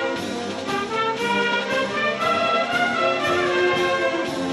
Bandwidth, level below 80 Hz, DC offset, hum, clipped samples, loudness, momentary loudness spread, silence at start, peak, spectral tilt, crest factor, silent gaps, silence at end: 12.5 kHz; -58 dBFS; under 0.1%; none; under 0.1%; -21 LUFS; 6 LU; 0 s; -8 dBFS; -4 dB/octave; 14 dB; none; 0 s